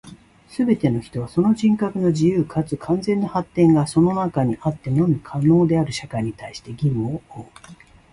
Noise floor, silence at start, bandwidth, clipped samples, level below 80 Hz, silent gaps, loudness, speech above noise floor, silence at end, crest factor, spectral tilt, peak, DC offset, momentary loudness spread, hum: -45 dBFS; 0.05 s; 11.5 kHz; under 0.1%; -50 dBFS; none; -20 LUFS; 25 dB; 0.4 s; 16 dB; -8 dB/octave; -4 dBFS; under 0.1%; 11 LU; none